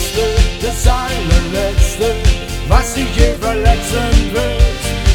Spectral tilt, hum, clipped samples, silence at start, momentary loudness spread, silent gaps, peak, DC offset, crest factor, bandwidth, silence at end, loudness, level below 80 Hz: -4.5 dB/octave; none; 0.1%; 0 s; 3 LU; none; 0 dBFS; under 0.1%; 12 dB; 17.5 kHz; 0 s; -15 LUFS; -14 dBFS